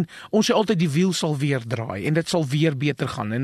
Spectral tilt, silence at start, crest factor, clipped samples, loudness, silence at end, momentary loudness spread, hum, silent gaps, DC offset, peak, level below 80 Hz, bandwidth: -5.5 dB/octave; 0 s; 16 dB; under 0.1%; -22 LUFS; 0 s; 6 LU; none; none; under 0.1%; -6 dBFS; -60 dBFS; 13 kHz